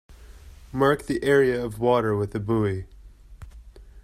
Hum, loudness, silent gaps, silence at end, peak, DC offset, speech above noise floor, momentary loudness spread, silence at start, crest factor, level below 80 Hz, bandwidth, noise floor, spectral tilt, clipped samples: none; -23 LUFS; none; 0.05 s; -8 dBFS; under 0.1%; 24 dB; 8 LU; 0.1 s; 18 dB; -46 dBFS; 14.5 kHz; -46 dBFS; -7 dB/octave; under 0.1%